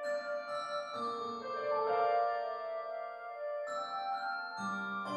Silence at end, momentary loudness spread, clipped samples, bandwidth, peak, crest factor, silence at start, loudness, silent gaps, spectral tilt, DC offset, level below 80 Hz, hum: 0 s; 9 LU; under 0.1%; 11.5 kHz; -20 dBFS; 16 dB; 0 s; -37 LUFS; none; -4.5 dB/octave; under 0.1%; -86 dBFS; none